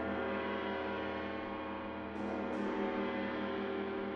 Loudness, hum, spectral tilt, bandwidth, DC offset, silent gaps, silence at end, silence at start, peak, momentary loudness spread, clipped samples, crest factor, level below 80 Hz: -38 LUFS; none; -7 dB/octave; 7.4 kHz; under 0.1%; none; 0 s; 0 s; -24 dBFS; 5 LU; under 0.1%; 14 dB; -66 dBFS